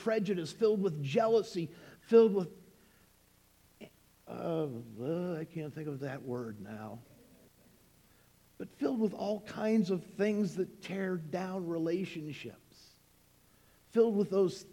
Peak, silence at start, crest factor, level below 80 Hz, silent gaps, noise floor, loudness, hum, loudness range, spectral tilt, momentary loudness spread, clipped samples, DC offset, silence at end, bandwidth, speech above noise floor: -12 dBFS; 0 s; 22 dB; -74 dBFS; none; -66 dBFS; -33 LUFS; none; 10 LU; -7 dB/octave; 16 LU; under 0.1%; under 0.1%; 0.05 s; 16.5 kHz; 33 dB